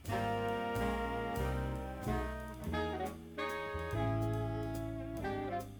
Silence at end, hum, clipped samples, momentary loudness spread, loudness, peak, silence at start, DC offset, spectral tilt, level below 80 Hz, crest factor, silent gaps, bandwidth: 0 s; none; under 0.1%; 6 LU; -38 LUFS; -22 dBFS; 0 s; under 0.1%; -6.5 dB/octave; -46 dBFS; 14 dB; none; over 20 kHz